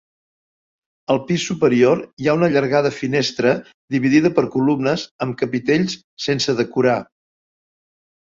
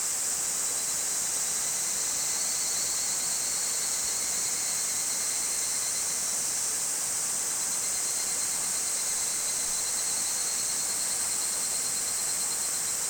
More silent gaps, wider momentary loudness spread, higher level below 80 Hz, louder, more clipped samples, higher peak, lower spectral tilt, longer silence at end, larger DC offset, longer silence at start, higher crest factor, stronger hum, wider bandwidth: first, 2.13-2.17 s, 3.74-3.88 s, 5.11-5.19 s, 6.04-6.17 s vs none; first, 9 LU vs 1 LU; first, -58 dBFS vs -64 dBFS; first, -19 LUFS vs -26 LUFS; neither; first, -2 dBFS vs -14 dBFS; first, -5.5 dB/octave vs 1.5 dB/octave; first, 1.25 s vs 0 s; neither; first, 1.1 s vs 0 s; about the same, 18 dB vs 14 dB; neither; second, 7.8 kHz vs over 20 kHz